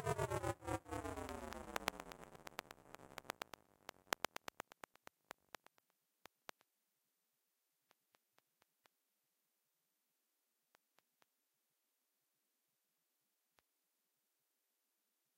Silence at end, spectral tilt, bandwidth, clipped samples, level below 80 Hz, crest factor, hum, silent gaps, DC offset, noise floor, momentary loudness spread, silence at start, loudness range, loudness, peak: 11.25 s; -4 dB/octave; 16.5 kHz; under 0.1%; -68 dBFS; 40 dB; none; none; under 0.1%; -87 dBFS; 17 LU; 0 s; 20 LU; -48 LUFS; -12 dBFS